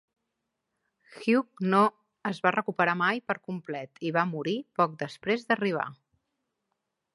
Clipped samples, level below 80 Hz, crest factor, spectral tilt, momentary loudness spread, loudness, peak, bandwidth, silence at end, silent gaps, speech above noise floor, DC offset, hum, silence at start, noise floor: under 0.1%; -78 dBFS; 22 dB; -6.5 dB/octave; 11 LU; -28 LUFS; -8 dBFS; 11.5 kHz; 1.2 s; none; 55 dB; under 0.1%; none; 1.1 s; -83 dBFS